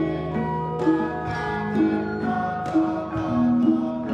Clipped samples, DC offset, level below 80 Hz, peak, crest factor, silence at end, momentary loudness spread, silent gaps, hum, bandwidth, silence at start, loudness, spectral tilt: under 0.1%; under 0.1%; -48 dBFS; -8 dBFS; 14 dB; 0 s; 6 LU; none; none; 7.8 kHz; 0 s; -24 LUFS; -8.5 dB/octave